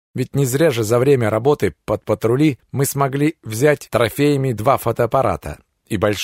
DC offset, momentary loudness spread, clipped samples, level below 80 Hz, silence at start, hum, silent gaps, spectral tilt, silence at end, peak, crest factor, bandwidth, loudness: under 0.1%; 6 LU; under 0.1%; -46 dBFS; 0.15 s; none; none; -6 dB/octave; 0 s; -2 dBFS; 16 dB; 16 kHz; -18 LUFS